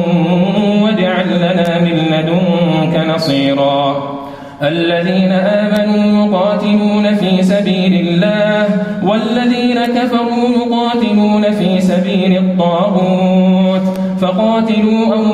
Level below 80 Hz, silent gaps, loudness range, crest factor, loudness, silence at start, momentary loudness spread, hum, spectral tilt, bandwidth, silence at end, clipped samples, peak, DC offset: -50 dBFS; none; 2 LU; 10 dB; -12 LUFS; 0 s; 3 LU; none; -7.5 dB/octave; 10.5 kHz; 0 s; under 0.1%; -2 dBFS; under 0.1%